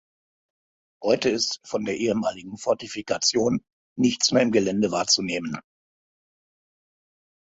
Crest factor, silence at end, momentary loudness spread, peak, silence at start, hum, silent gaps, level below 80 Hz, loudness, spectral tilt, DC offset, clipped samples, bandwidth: 20 dB; 1.95 s; 10 LU; -6 dBFS; 1 s; none; 3.73-3.96 s; -62 dBFS; -24 LUFS; -3.5 dB/octave; under 0.1%; under 0.1%; 8.2 kHz